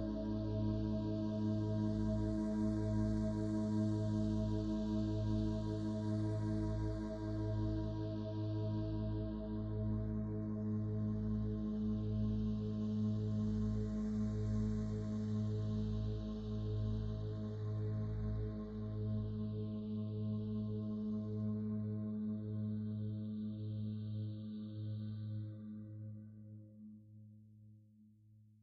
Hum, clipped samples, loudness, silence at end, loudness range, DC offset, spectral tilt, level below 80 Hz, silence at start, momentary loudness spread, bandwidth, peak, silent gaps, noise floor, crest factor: none; under 0.1%; -40 LUFS; 0.2 s; 7 LU; under 0.1%; -9.5 dB/octave; -50 dBFS; 0 s; 7 LU; 7.6 kHz; -26 dBFS; none; -65 dBFS; 14 dB